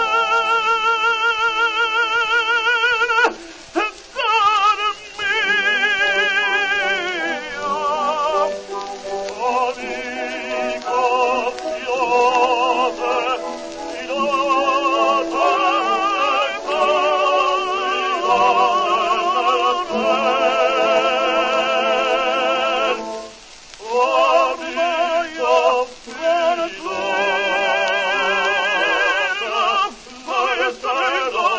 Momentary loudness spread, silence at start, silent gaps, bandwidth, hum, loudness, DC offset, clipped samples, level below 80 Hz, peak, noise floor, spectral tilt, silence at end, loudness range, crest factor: 8 LU; 0 s; none; 8 kHz; none; -18 LUFS; under 0.1%; under 0.1%; -56 dBFS; -4 dBFS; -40 dBFS; -1.5 dB/octave; 0 s; 4 LU; 16 dB